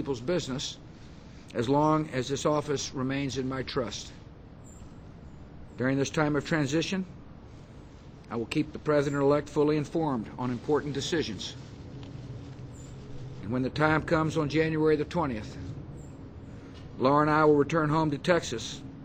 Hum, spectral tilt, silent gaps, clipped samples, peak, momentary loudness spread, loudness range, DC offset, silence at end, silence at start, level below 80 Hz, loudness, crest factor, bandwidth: none; -5.5 dB/octave; none; under 0.1%; -10 dBFS; 23 LU; 6 LU; under 0.1%; 0 s; 0 s; -52 dBFS; -28 LUFS; 20 dB; 9.2 kHz